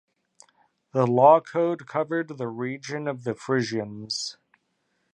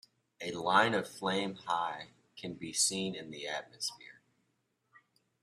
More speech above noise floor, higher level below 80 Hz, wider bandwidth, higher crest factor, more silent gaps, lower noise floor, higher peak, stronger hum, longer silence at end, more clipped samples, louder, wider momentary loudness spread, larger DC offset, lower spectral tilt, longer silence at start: first, 49 dB vs 45 dB; about the same, -74 dBFS vs -76 dBFS; second, 10.5 kHz vs 15 kHz; about the same, 22 dB vs 24 dB; neither; second, -73 dBFS vs -79 dBFS; first, -4 dBFS vs -12 dBFS; neither; second, 0.8 s vs 1.3 s; neither; first, -25 LUFS vs -33 LUFS; second, 15 LU vs 18 LU; neither; first, -5.5 dB/octave vs -2.5 dB/octave; first, 0.95 s vs 0.4 s